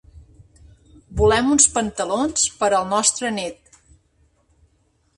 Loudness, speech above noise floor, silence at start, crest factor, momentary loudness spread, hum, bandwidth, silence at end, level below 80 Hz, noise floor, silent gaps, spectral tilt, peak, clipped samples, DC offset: -18 LUFS; 44 dB; 0.15 s; 22 dB; 12 LU; none; 11.5 kHz; 1.65 s; -40 dBFS; -63 dBFS; none; -3 dB/octave; 0 dBFS; under 0.1%; under 0.1%